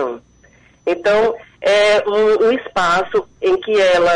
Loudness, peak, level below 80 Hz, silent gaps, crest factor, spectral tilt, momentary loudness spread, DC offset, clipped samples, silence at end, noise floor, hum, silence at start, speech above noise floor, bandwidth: -16 LUFS; -8 dBFS; -48 dBFS; none; 8 dB; -3.5 dB/octave; 9 LU; under 0.1%; under 0.1%; 0 s; -50 dBFS; none; 0 s; 36 dB; 10.5 kHz